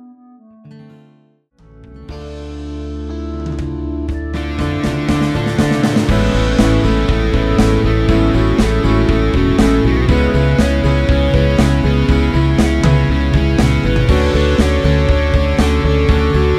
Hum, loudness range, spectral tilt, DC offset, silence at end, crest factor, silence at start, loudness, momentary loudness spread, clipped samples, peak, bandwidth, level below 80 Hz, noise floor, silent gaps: none; 12 LU; -7 dB/octave; under 0.1%; 0 s; 12 dB; 0.65 s; -14 LUFS; 10 LU; under 0.1%; 0 dBFS; 12.5 kHz; -18 dBFS; -52 dBFS; none